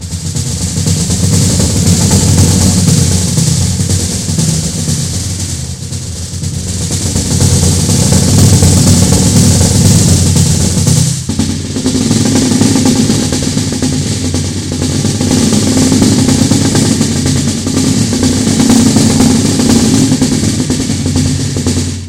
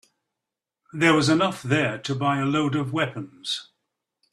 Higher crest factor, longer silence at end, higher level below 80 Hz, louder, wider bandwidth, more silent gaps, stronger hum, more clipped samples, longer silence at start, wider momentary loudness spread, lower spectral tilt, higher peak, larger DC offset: second, 10 dB vs 22 dB; second, 0 s vs 0.7 s; first, -26 dBFS vs -62 dBFS; first, -10 LUFS vs -23 LUFS; first, 16.5 kHz vs 13 kHz; neither; neither; first, 0.4% vs under 0.1%; second, 0 s vs 0.95 s; second, 8 LU vs 11 LU; about the same, -4.5 dB/octave vs -5 dB/octave; first, 0 dBFS vs -4 dBFS; neither